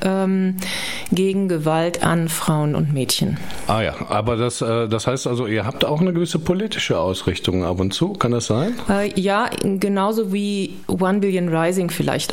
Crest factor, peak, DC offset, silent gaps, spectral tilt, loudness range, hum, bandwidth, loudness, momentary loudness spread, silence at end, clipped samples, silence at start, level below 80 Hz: 18 dB; -2 dBFS; 0.6%; none; -5.5 dB/octave; 1 LU; none; 16.5 kHz; -20 LUFS; 3 LU; 0 s; under 0.1%; 0 s; -46 dBFS